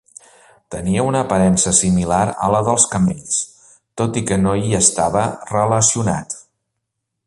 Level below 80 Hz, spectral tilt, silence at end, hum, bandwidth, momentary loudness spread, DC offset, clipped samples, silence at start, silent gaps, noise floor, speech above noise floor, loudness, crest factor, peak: -42 dBFS; -4.5 dB/octave; 0.85 s; none; 11.5 kHz; 11 LU; under 0.1%; under 0.1%; 0.7 s; none; -77 dBFS; 60 dB; -16 LUFS; 18 dB; 0 dBFS